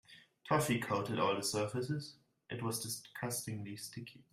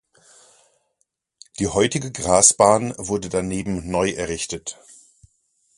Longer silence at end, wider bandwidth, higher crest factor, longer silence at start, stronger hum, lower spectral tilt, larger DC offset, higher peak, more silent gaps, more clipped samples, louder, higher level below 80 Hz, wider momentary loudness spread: second, 0.15 s vs 1.05 s; first, 16 kHz vs 11.5 kHz; about the same, 20 dB vs 22 dB; second, 0.1 s vs 1.6 s; neither; about the same, -4.5 dB/octave vs -3.5 dB/octave; neither; second, -18 dBFS vs 0 dBFS; neither; neither; second, -38 LUFS vs -20 LUFS; second, -72 dBFS vs -46 dBFS; about the same, 13 LU vs 14 LU